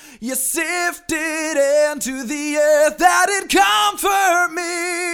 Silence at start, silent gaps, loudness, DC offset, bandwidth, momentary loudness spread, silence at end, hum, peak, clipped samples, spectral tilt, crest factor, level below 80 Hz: 0.05 s; none; -17 LUFS; under 0.1%; over 20 kHz; 8 LU; 0 s; none; 0 dBFS; under 0.1%; -1 dB/octave; 18 dB; -50 dBFS